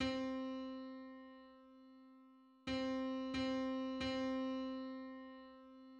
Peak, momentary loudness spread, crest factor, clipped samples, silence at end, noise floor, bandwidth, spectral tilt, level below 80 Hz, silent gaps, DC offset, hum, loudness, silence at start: -28 dBFS; 22 LU; 16 dB; under 0.1%; 0 s; -65 dBFS; 8.6 kHz; -5 dB/octave; -68 dBFS; none; under 0.1%; none; -43 LUFS; 0 s